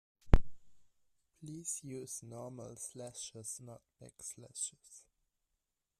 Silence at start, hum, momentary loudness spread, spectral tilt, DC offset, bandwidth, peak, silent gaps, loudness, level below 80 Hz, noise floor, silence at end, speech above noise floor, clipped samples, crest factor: 0.25 s; none; 22 LU; -4.5 dB/octave; under 0.1%; 13.5 kHz; -8 dBFS; none; -41 LUFS; -40 dBFS; -86 dBFS; 1 s; 39 dB; under 0.1%; 30 dB